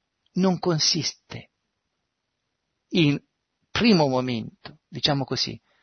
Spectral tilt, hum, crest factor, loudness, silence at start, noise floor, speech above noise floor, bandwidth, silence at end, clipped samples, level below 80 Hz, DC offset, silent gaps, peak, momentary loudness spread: -4.5 dB/octave; none; 20 dB; -23 LUFS; 0.35 s; -79 dBFS; 56 dB; 6.6 kHz; 0.25 s; under 0.1%; -58 dBFS; under 0.1%; none; -6 dBFS; 20 LU